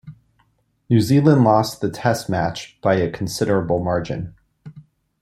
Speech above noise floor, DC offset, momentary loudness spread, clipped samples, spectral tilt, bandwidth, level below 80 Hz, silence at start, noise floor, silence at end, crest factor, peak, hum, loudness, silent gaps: 45 dB; under 0.1%; 10 LU; under 0.1%; -6.5 dB/octave; 14 kHz; -50 dBFS; 0.05 s; -63 dBFS; 0.4 s; 18 dB; -2 dBFS; none; -19 LUFS; none